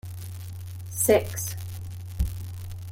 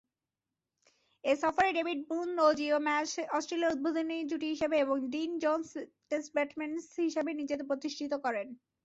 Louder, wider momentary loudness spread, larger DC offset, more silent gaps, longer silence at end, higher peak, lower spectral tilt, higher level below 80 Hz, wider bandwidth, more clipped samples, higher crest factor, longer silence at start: first, -29 LUFS vs -32 LUFS; first, 17 LU vs 9 LU; neither; neither; second, 0 s vs 0.3 s; first, -8 dBFS vs -14 dBFS; first, -4.5 dB/octave vs -3 dB/octave; first, -40 dBFS vs -72 dBFS; first, 17 kHz vs 8 kHz; neither; about the same, 22 dB vs 20 dB; second, 0.05 s vs 1.25 s